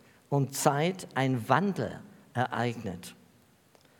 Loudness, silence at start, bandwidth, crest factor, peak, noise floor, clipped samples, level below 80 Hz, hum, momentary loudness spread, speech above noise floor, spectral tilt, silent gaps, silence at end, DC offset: -30 LUFS; 0.3 s; 18 kHz; 24 dB; -6 dBFS; -62 dBFS; under 0.1%; -74 dBFS; none; 13 LU; 33 dB; -5.5 dB/octave; none; 0.85 s; under 0.1%